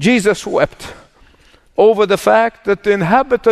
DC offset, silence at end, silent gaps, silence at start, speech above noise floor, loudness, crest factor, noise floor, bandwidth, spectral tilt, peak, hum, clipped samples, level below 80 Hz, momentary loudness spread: under 0.1%; 0 s; none; 0 s; 36 dB; -14 LUFS; 14 dB; -49 dBFS; 13.5 kHz; -5 dB/octave; 0 dBFS; none; under 0.1%; -44 dBFS; 10 LU